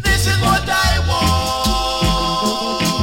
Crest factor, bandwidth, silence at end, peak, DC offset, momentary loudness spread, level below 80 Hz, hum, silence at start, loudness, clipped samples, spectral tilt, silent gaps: 14 dB; 17.5 kHz; 0 s; -2 dBFS; under 0.1%; 3 LU; -24 dBFS; none; 0 s; -16 LUFS; under 0.1%; -4 dB/octave; none